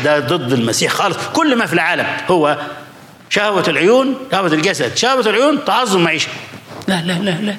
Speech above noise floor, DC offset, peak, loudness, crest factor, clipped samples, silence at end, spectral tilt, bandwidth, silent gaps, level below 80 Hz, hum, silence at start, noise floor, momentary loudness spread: 22 dB; under 0.1%; -2 dBFS; -15 LUFS; 12 dB; under 0.1%; 0 s; -4 dB/octave; 16.5 kHz; none; -60 dBFS; none; 0 s; -37 dBFS; 7 LU